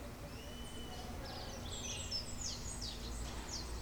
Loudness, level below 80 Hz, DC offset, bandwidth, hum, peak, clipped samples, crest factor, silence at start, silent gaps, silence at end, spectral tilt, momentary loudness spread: -44 LUFS; -50 dBFS; under 0.1%; over 20 kHz; none; -30 dBFS; under 0.1%; 16 dB; 0 s; none; 0 s; -3 dB/octave; 8 LU